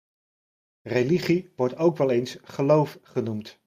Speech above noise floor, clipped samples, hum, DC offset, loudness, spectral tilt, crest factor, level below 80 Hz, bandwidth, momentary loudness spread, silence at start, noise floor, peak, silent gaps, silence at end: over 66 dB; under 0.1%; none; under 0.1%; -25 LUFS; -7 dB/octave; 18 dB; -64 dBFS; 15.5 kHz; 9 LU; 0.85 s; under -90 dBFS; -8 dBFS; none; 0.15 s